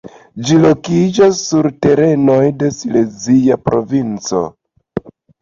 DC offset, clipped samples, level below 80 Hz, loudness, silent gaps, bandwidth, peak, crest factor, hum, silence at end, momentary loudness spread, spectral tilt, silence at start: under 0.1%; under 0.1%; -46 dBFS; -13 LUFS; none; 7.6 kHz; 0 dBFS; 12 dB; none; 0.3 s; 15 LU; -6 dB/octave; 0.05 s